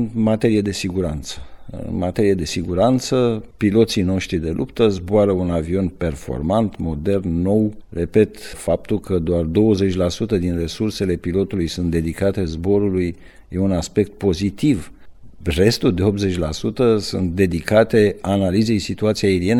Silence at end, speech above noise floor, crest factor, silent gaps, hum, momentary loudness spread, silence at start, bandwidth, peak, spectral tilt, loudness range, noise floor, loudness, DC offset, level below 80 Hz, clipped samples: 0 s; 19 dB; 16 dB; none; none; 7 LU; 0 s; 14 kHz; -2 dBFS; -6.5 dB/octave; 3 LU; -38 dBFS; -19 LUFS; 0.3%; -38 dBFS; under 0.1%